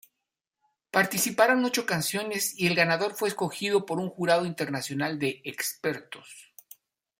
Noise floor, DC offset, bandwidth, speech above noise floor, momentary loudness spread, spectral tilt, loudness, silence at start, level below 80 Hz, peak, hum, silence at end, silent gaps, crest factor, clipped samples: -85 dBFS; under 0.1%; 16.5 kHz; 58 dB; 10 LU; -3.5 dB/octave; -27 LUFS; 0.95 s; -72 dBFS; -6 dBFS; none; 0.75 s; none; 22 dB; under 0.1%